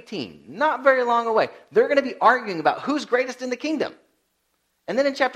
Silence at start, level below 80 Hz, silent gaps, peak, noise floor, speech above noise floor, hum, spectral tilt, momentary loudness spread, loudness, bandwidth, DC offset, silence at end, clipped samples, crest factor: 0.1 s; -72 dBFS; none; -2 dBFS; -71 dBFS; 49 dB; none; -4.5 dB/octave; 11 LU; -22 LUFS; 11.5 kHz; under 0.1%; 0 s; under 0.1%; 20 dB